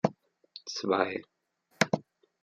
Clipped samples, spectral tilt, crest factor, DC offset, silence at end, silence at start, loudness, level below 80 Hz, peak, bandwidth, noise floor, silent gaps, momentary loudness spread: under 0.1%; -4.5 dB/octave; 26 dB; under 0.1%; 0.4 s; 0.05 s; -31 LUFS; -72 dBFS; -8 dBFS; 14.5 kHz; -54 dBFS; none; 14 LU